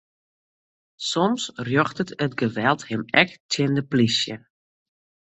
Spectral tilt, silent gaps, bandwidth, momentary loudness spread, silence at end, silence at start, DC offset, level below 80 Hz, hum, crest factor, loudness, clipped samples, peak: -4.5 dB/octave; 3.40-3.49 s; 8.2 kHz; 8 LU; 1 s; 1 s; under 0.1%; -62 dBFS; none; 24 dB; -23 LUFS; under 0.1%; -2 dBFS